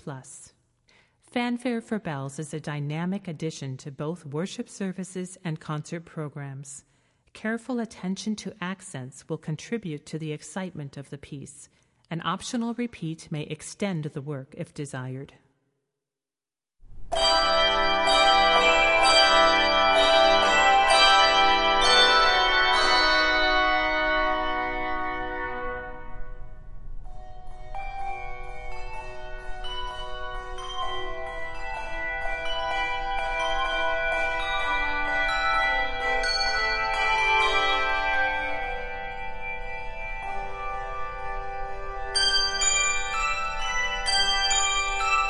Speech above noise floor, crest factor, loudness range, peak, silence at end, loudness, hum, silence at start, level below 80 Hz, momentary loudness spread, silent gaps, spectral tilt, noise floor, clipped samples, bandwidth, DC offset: over 59 dB; 20 dB; 17 LU; -6 dBFS; 0 s; -24 LUFS; none; 0.05 s; -42 dBFS; 19 LU; none; -2.5 dB/octave; under -90 dBFS; under 0.1%; 11.5 kHz; under 0.1%